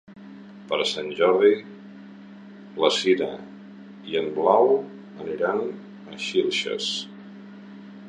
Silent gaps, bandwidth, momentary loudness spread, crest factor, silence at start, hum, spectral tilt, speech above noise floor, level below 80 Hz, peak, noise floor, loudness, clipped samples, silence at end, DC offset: none; 10 kHz; 25 LU; 22 dB; 0.1 s; none; -4 dB/octave; 21 dB; -70 dBFS; -4 dBFS; -43 dBFS; -23 LUFS; under 0.1%; 0 s; under 0.1%